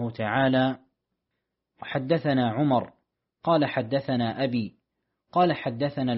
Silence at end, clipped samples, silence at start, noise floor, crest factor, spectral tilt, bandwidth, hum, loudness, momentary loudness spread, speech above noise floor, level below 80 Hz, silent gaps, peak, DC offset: 0 s; under 0.1%; 0 s; -82 dBFS; 16 dB; -5 dB/octave; 5.8 kHz; none; -26 LUFS; 10 LU; 57 dB; -64 dBFS; none; -10 dBFS; under 0.1%